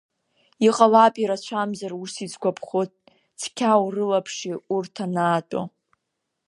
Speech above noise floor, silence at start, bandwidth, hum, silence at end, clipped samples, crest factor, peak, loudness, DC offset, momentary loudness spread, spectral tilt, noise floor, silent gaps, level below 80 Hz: 58 dB; 0.6 s; 11.5 kHz; none; 0.8 s; under 0.1%; 22 dB; -2 dBFS; -23 LUFS; under 0.1%; 16 LU; -5 dB/octave; -79 dBFS; none; -76 dBFS